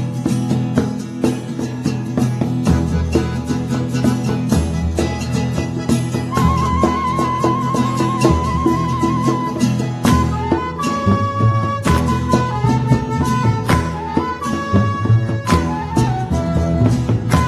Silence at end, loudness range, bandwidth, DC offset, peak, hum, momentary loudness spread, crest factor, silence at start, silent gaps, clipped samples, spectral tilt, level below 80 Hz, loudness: 0 s; 2 LU; 14 kHz; under 0.1%; 0 dBFS; none; 5 LU; 16 dB; 0 s; none; under 0.1%; -6.5 dB/octave; -30 dBFS; -17 LUFS